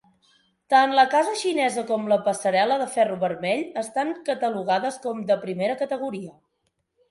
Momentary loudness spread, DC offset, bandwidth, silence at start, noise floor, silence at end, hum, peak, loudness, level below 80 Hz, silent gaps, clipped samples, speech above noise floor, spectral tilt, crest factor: 10 LU; under 0.1%; 11.5 kHz; 0.7 s; -74 dBFS; 0.8 s; none; -4 dBFS; -23 LUFS; -74 dBFS; none; under 0.1%; 51 dB; -4 dB/octave; 20 dB